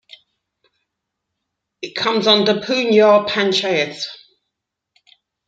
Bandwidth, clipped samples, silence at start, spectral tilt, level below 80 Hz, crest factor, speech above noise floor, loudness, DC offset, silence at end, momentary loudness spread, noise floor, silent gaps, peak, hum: 7.8 kHz; under 0.1%; 1.8 s; -4 dB/octave; -66 dBFS; 18 dB; 64 dB; -15 LUFS; under 0.1%; 1.35 s; 16 LU; -80 dBFS; none; 0 dBFS; none